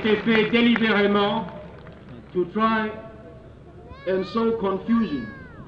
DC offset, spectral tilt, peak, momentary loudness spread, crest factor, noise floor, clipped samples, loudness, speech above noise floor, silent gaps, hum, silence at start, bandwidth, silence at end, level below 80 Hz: under 0.1%; -7.5 dB/octave; -8 dBFS; 23 LU; 16 dB; -44 dBFS; under 0.1%; -22 LUFS; 22 dB; none; none; 0 s; 5.8 kHz; 0 s; -50 dBFS